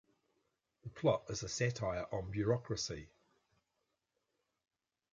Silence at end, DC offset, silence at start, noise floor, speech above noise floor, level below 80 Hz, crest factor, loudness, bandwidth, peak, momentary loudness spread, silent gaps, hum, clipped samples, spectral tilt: 2.05 s; under 0.1%; 0.85 s; -86 dBFS; 48 dB; -62 dBFS; 22 dB; -38 LUFS; 9.4 kHz; -20 dBFS; 12 LU; none; none; under 0.1%; -5 dB/octave